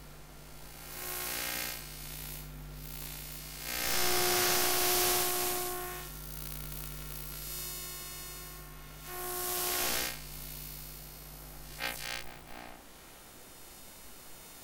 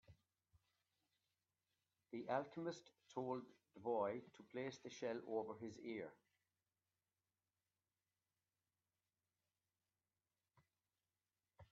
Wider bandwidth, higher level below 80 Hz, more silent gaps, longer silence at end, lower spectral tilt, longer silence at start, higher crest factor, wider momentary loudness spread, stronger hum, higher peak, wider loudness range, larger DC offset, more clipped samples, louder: first, 19 kHz vs 7.2 kHz; first, -52 dBFS vs under -90 dBFS; neither; about the same, 0 s vs 0.1 s; second, -1.5 dB/octave vs -5 dB/octave; about the same, 0 s vs 0.1 s; about the same, 22 dB vs 24 dB; first, 23 LU vs 11 LU; second, none vs 50 Hz at -80 dBFS; first, -14 dBFS vs -30 dBFS; first, 13 LU vs 9 LU; neither; neither; first, -33 LUFS vs -49 LUFS